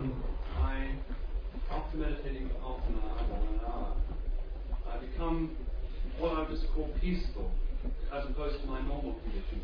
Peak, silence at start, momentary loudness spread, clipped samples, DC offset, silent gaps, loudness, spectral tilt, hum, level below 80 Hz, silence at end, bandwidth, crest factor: -20 dBFS; 0 s; 7 LU; under 0.1%; under 0.1%; none; -38 LUFS; -9 dB/octave; none; -34 dBFS; 0 s; 5.2 kHz; 14 dB